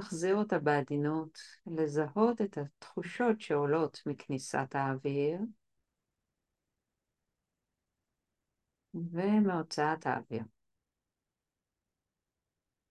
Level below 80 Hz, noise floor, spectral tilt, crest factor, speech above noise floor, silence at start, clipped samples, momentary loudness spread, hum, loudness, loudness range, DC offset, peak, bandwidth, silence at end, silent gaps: -78 dBFS; under -90 dBFS; -6.5 dB/octave; 22 dB; over 57 dB; 0 s; under 0.1%; 12 LU; none; -33 LUFS; 8 LU; under 0.1%; -14 dBFS; 11.5 kHz; 2.45 s; none